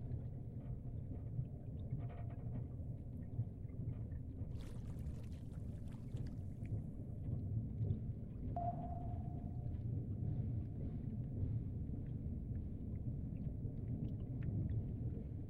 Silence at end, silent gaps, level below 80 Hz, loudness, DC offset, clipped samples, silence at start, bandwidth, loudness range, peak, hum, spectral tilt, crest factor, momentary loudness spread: 0 s; none; -52 dBFS; -46 LUFS; under 0.1%; under 0.1%; 0 s; 4.7 kHz; 4 LU; -28 dBFS; none; -10.5 dB/octave; 16 dB; 6 LU